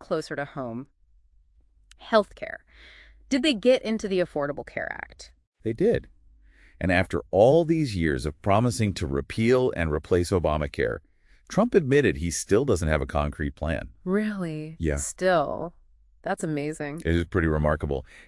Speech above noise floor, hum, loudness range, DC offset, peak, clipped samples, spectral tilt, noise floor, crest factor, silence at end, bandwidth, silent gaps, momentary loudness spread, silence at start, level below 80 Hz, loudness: 35 dB; none; 5 LU; under 0.1%; -6 dBFS; under 0.1%; -6 dB/octave; -60 dBFS; 20 dB; 0.05 s; 12 kHz; 5.47-5.52 s; 12 LU; 0 s; -42 dBFS; -25 LUFS